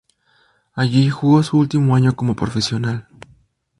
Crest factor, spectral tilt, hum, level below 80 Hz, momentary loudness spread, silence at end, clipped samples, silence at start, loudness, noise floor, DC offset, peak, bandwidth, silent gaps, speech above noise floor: 16 dB; -7 dB/octave; none; -48 dBFS; 9 LU; 0.8 s; under 0.1%; 0.75 s; -17 LUFS; -59 dBFS; under 0.1%; -2 dBFS; 11.5 kHz; none; 43 dB